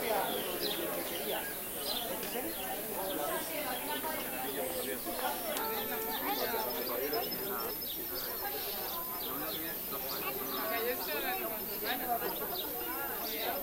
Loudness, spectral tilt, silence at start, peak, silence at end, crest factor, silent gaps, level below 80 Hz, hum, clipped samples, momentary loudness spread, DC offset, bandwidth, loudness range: -35 LUFS; -2 dB/octave; 0 s; -18 dBFS; 0 s; 18 dB; none; -62 dBFS; none; under 0.1%; 3 LU; under 0.1%; 16 kHz; 1 LU